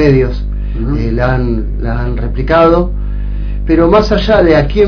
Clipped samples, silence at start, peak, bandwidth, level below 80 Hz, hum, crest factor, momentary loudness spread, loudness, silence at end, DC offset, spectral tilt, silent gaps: 0.5%; 0 s; 0 dBFS; 5.4 kHz; -16 dBFS; 50 Hz at -15 dBFS; 10 dB; 12 LU; -12 LUFS; 0 s; under 0.1%; -8 dB/octave; none